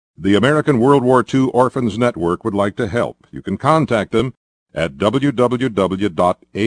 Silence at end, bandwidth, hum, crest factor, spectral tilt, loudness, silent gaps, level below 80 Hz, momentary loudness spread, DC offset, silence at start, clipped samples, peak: 0 s; 10 kHz; none; 16 dB; -7 dB/octave; -17 LUFS; 4.37-4.66 s; -48 dBFS; 10 LU; under 0.1%; 0.2 s; under 0.1%; 0 dBFS